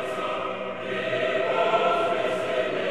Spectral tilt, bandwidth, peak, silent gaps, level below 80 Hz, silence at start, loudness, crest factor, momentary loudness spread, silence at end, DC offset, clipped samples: -4.5 dB/octave; 12.5 kHz; -10 dBFS; none; -66 dBFS; 0 s; -25 LUFS; 16 dB; 8 LU; 0 s; 0.4%; under 0.1%